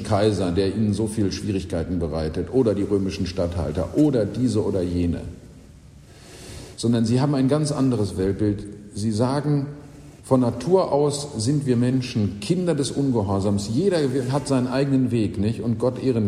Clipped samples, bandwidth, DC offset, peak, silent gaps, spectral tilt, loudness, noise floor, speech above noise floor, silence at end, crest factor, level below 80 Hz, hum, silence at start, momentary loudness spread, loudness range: under 0.1%; 13 kHz; under 0.1%; -4 dBFS; none; -7 dB/octave; -22 LUFS; -46 dBFS; 24 dB; 0 s; 18 dB; -44 dBFS; none; 0 s; 6 LU; 3 LU